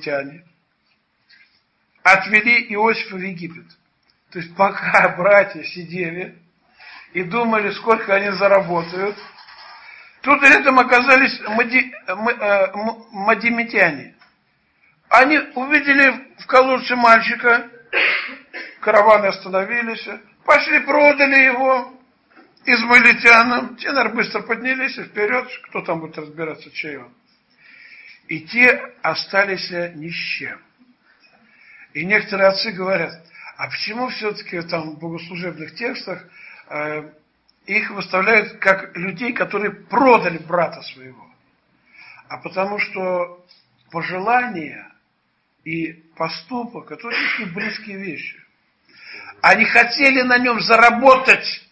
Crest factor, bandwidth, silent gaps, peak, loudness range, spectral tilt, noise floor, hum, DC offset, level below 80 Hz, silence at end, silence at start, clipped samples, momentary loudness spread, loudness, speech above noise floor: 18 dB; 8.8 kHz; none; 0 dBFS; 11 LU; -4.5 dB/octave; -67 dBFS; none; under 0.1%; -62 dBFS; 0.1 s; 0 s; under 0.1%; 18 LU; -16 LUFS; 49 dB